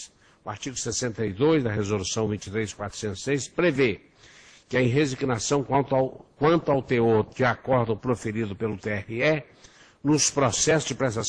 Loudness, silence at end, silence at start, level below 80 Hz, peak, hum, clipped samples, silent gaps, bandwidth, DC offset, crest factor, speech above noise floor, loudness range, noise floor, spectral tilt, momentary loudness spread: -25 LUFS; 0 s; 0 s; -54 dBFS; -8 dBFS; none; under 0.1%; none; 10.5 kHz; under 0.1%; 16 dB; 27 dB; 3 LU; -52 dBFS; -4.5 dB/octave; 9 LU